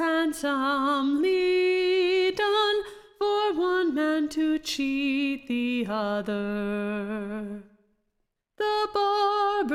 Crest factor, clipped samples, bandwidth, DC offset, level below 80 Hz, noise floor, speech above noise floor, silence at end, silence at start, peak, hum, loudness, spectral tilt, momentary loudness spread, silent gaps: 12 dB; under 0.1%; 15 kHz; under 0.1%; -60 dBFS; -78 dBFS; 51 dB; 0 s; 0 s; -14 dBFS; none; -26 LUFS; -4.5 dB/octave; 8 LU; none